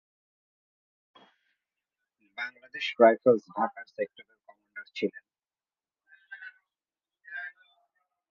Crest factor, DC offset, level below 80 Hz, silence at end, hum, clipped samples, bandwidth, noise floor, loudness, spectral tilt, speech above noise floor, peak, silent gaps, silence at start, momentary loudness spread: 26 dB; under 0.1%; -86 dBFS; 0.8 s; none; under 0.1%; 7 kHz; under -90 dBFS; -28 LUFS; -2.5 dB/octave; over 63 dB; -6 dBFS; none; 2.4 s; 25 LU